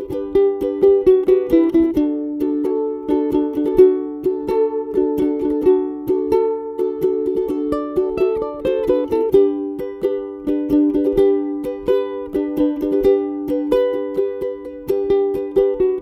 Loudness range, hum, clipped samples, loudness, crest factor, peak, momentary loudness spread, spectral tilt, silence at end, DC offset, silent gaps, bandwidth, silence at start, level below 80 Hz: 3 LU; none; under 0.1%; -18 LUFS; 16 dB; -2 dBFS; 8 LU; -8 dB/octave; 0 s; under 0.1%; none; 14 kHz; 0 s; -44 dBFS